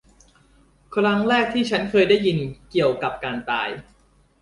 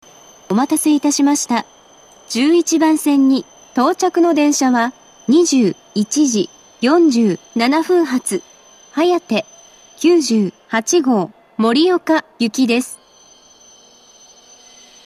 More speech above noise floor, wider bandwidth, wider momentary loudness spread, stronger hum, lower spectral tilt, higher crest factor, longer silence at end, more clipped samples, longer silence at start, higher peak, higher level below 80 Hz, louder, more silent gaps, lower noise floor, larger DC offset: first, 37 dB vs 33 dB; second, 11.5 kHz vs 14.5 kHz; about the same, 11 LU vs 9 LU; neither; first, -6 dB/octave vs -4 dB/octave; about the same, 18 dB vs 16 dB; second, 0.6 s vs 2.1 s; neither; first, 0.9 s vs 0.5 s; second, -6 dBFS vs 0 dBFS; first, -54 dBFS vs -68 dBFS; second, -21 LUFS vs -16 LUFS; neither; first, -58 dBFS vs -47 dBFS; neither